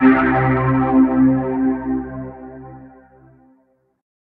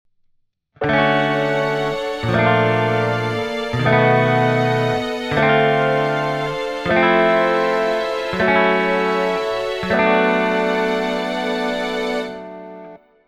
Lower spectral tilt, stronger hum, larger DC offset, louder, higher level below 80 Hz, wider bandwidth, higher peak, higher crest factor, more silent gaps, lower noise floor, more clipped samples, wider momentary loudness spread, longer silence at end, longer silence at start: first, -11.5 dB/octave vs -6.5 dB/octave; neither; neither; about the same, -16 LUFS vs -18 LUFS; first, -42 dBFS vs -48 dBFS; second, 3.9 kHz vs 14 kHz; about the same, 0 dBFS vs -2 dBFS; about the same, 18 dB vs 16 dB; neither; about the same, -60 dBFS vs -63 dBFS; neither; first, 22 LU vs 8 LU; first, 1.5 s vs 0.3 s; second, 0 s vs 0.8 s